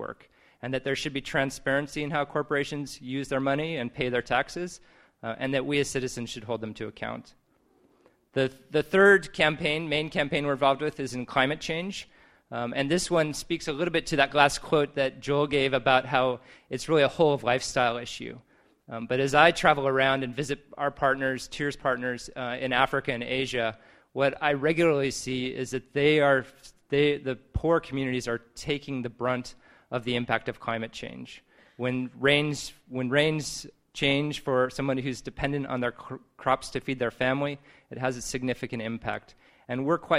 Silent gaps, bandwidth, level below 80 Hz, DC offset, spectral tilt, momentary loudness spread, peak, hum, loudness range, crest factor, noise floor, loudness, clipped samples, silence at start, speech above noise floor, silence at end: none; 14.5 kHz; -54 dBFS; under 0.1%; -4.5 dB/octave; 13 LU; -4 dBFS; none; 6 LU; 24 dB; -65 dBFS; -27 LUFS; under 0.1%; 0 s; 38 dB; 0 s